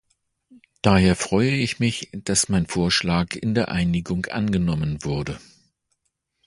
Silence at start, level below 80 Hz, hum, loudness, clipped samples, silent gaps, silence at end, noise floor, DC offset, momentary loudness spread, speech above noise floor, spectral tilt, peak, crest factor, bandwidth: 0.85 s; -42 dBFS; none; -22 LUFS; under 0.1%; none; 1.1 s; -75 dBFS; under 0.1%; 8 LU; 53 dB; -5 dB/octave; 0 dBFS; 22 dB; 11.5 kHz